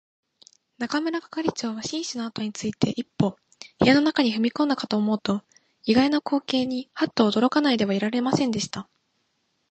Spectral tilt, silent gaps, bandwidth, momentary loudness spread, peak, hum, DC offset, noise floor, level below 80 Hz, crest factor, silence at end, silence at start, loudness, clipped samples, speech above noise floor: -5 dB/octave; none; 8.8 kHz; 10 LU; -4 dBFS; none; under 0.1%; -72 dBFS; -60 dBFS; 20 dB; 0.9 s; 0.8 s; -24 LUFS; under 0.1%; 49 dB